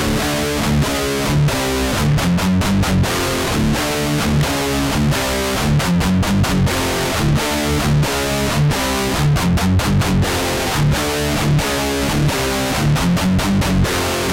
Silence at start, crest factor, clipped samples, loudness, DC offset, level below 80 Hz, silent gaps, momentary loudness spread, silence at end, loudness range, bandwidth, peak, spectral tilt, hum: 0 s; 10 dB; under 0.1%; -17 LUFS; under 0.1%; -28 dBFS; none; 2 LU; 0 s; 0 LU; 17 kHz; -6 dBFS; -5 dB/octave; none